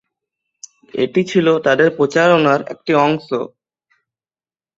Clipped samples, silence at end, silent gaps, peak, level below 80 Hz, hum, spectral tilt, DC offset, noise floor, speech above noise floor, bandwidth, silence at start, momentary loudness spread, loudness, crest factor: under 0.1%; 1.3 s; none; -2 dBFS; -60 dBFS; none; -6 dB/octave; under 0.1%; under -90 dBFS; over 75 dB; 7.8 kHz; 0.95 s; 11 LU; -15 LUFS; 16 dB